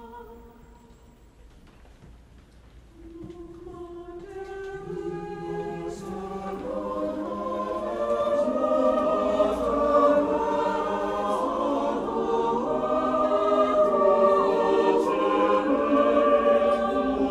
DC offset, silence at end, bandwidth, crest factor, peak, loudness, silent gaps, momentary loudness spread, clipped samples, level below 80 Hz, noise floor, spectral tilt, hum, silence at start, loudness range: under 0.1%; 0 s; 11 kHz; 16 dB; -8 dBFS; -24 LUFS; none; 18 LU; under 0.1%; -50 dBFS; -52 dBFS; -6.5 dB/octave; none; 0 s; 17 LU